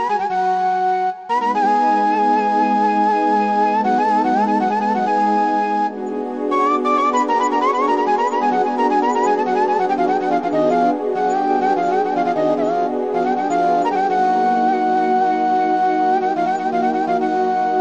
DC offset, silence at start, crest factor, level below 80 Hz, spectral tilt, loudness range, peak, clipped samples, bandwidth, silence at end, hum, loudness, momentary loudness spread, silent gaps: 0.2%; 0 s; 12 dB; -66 dBFS; -5.5 dB/octave; 1 LU; -4 dBFS; under 0.1%; 8.2 kHz; 0 s; none; -17 LUFS; 3 LU; none